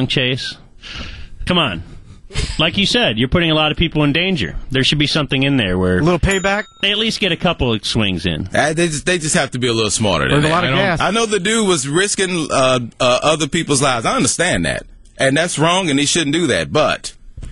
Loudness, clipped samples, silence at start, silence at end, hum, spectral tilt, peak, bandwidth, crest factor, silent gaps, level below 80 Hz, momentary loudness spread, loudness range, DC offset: -15 LUFS; under 0.1%; 0 s; 0 s; none; -4 dB/octave; -2 dBFS; 11.5 kHz; 14 dB; none; -34 dBFS; 7 LU; 1 LU; under 0.1%